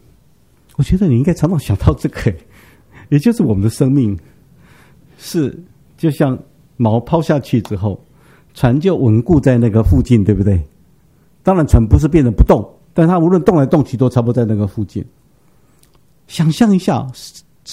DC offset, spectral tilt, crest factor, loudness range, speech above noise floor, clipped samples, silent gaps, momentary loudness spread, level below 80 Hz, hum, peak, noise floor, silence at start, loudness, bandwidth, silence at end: 0.2%; -8 dB/octave; 14 dB; 5 LU; 40 dB; 0.1%; none; 12 LU; -26 dBFS; none; 0 dBFS; -52 dBFS; 0.8 s; -14 LUFS; 15.5 kHz; 0 s